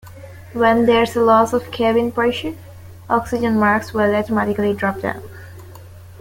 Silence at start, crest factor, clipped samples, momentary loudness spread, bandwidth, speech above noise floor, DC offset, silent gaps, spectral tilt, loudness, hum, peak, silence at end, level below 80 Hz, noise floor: 0.05 s; 16 dB; under 0.1%; 17 LU; 17 kHz; 22 dB; under 0.1%; none; -6 dB/octave; -17 LUFS; none; -2 dBFS; 0 s; -48 dBFS; -38 dBFS